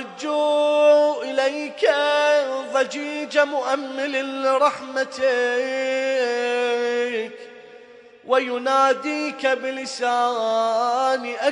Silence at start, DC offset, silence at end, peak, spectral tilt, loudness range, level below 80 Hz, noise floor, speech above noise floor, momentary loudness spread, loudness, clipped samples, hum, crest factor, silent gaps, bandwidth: 0 s; under 0.1%; 0 s; -4 dBFS; -2 dB/octave; 4 LU; -76 dBFS; -46 dBFS; 24 dB; 7 LU; -21 LUFS; under 0.1%; none; 16 dB; none; 10.5 kHz